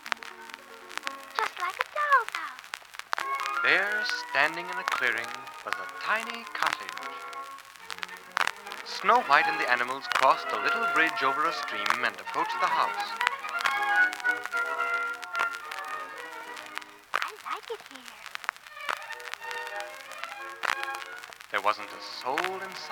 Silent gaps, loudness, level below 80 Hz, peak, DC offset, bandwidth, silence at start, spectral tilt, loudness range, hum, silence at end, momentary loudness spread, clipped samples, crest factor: none; -29 LUFS; -78 dBFS; 0 dBFS; under 0.1%; over 20 kHz; 0 s; -1 dB/octave; 10 LU; none; 0 s; 16 LU; under 0.1%; 30 dB